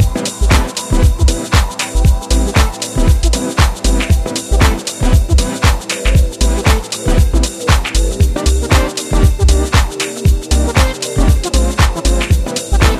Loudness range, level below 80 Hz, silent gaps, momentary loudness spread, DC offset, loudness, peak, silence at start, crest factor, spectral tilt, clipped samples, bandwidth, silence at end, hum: 1 LU; -14 dBFS; none; 4 LU; under 0.1%; -14 LUFS; 0 dBFS; 0 s; 12 dB; -4.5 dB/octave; under 0.1%; 15 kHz; 0 s; none